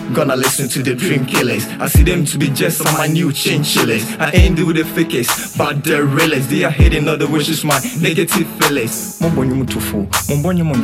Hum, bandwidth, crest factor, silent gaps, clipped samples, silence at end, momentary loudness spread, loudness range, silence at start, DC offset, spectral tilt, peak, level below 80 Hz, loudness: none; 16.5 kHz; 14 dB; none; under 0.1%; 0 s; 5 LU; 2 LU; 0 s; under 0.1%; -4.5 dB/octave; 0 dBFS; -24 dBFS; -15 LUFS